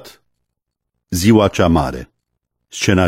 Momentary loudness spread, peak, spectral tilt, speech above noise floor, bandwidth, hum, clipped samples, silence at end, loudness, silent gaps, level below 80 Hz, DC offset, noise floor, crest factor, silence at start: 17 LU; 0 dBFS; -5.5 dB/octave; 63 dB; 16.5 kHz; none; under 0.1%; 0 s; -15 LUFS; none; -36 dBFS; under 0.1%; -77 dBFS; 18 dB; 0.05 s